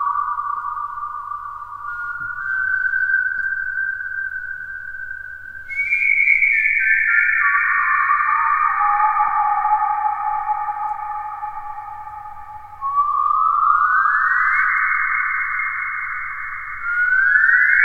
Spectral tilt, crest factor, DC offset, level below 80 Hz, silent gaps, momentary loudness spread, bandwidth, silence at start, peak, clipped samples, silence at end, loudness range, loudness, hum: -2.5 dB/octave; 18 dB; under 0.1%; -50 dBFS; none; 16 LU; 7.2 kHz; 0 s; -2 dBFS; under 0.1%; 0 s; 7 LU; -18 LUFS; 50 Hz at -55 dBFS